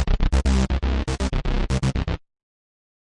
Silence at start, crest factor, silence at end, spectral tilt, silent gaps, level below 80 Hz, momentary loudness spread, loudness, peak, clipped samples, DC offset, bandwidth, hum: 0 s; 14 dB; 0.95 s; -6 dB/octave; none; -24 dBFS; 7 LU; -24 LUFS; -8 dBFS; under 0.1%; under 0.1%; 11 kHz; none